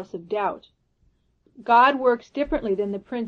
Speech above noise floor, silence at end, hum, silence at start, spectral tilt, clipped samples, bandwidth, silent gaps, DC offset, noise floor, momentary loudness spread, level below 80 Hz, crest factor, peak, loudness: 42 dB; 0 s; none; 0 s; -6.5 dB/octave; under 0.1%; 7 kHz; none; under 0.1%; -65 dBFS; 13 LU; -50 dBFS; 18 dB; -6 dBFS; -22 LUFS